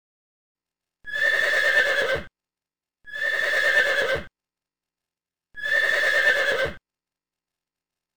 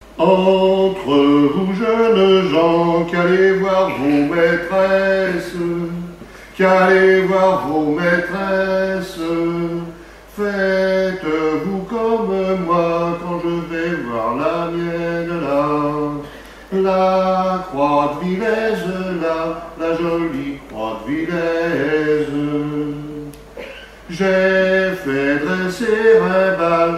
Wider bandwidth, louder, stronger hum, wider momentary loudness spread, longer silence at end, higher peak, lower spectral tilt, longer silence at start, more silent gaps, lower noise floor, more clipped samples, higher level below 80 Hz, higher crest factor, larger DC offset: first, 19 kHz vs 14.5 kHz; second, -21 LUFS vs -17 LUFS; neither; about the same, 11 LU vs 12 LU; first, 1.4 s vs 0 s; second, -8 dBFS vs -2 dBFS; second, -1.5 dB/octave vs -6.5 dB/octave; first, 1.05 s vs 0 s; neither; first, under -90 dBFS vs -37 dBFS; neither; second, -54 dBFS vs -46 dBFS; about the same, 18 dB vs 14 dB; neither